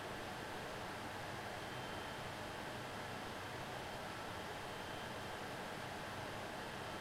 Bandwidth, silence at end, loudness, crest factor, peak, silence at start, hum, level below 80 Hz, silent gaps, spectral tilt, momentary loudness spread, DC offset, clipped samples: 16.5 kHz; 0 s; -46 LUFS; 14 dB; -34 dBFS; 0 s; none; -66 dBFS; none; -4 dB/octave; 1 LU; under 0.1%; under 0.1%